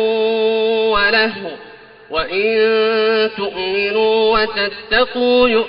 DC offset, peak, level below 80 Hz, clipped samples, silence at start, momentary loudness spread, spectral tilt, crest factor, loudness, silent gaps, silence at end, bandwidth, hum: under 0.1%; -2 dBFS; -44 dBFS; under 0.1%; 0 s; 8 LU; -0.5 dB/octave; 14 dB; -15 LUFS; none; 0 s; 5.4 kHz; none